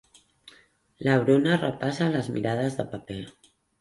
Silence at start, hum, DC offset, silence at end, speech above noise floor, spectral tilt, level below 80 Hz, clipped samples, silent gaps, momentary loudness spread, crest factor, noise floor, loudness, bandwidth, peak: 1 s; none; under 0.1%; 0.5 s; 34 dB; -7 dB/octave; -60 dBFS; under 0.1%; none; 16 LU; 18 dB; -59 dBFS; -25 LUFS; 11.5 kHz; -8 dBFS